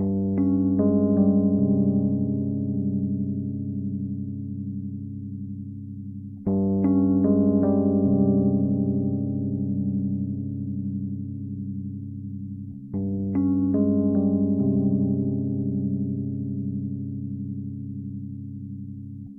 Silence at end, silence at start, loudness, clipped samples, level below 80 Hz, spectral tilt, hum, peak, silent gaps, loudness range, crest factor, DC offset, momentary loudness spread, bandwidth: 0 s; 0 s; -25 LUFS; under 0.1%; -54 dBFS; -15.5 dB/octave; none; -10 dBFS; none; 9 LU; 14 dB; under 0.1%; 14 LU; 2.1 kHz